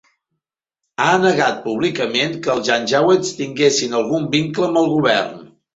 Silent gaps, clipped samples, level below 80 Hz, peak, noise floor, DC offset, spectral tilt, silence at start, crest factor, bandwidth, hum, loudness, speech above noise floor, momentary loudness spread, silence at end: none; under 0.1%; -60 dBFS; -2 dBFS; -79 dBFS; under 0.1%; -4 dB/octave; 1 s; 16 dB; 8 kHz; none; -17 LUFS; 62 dB; 5 LU; 0.3 s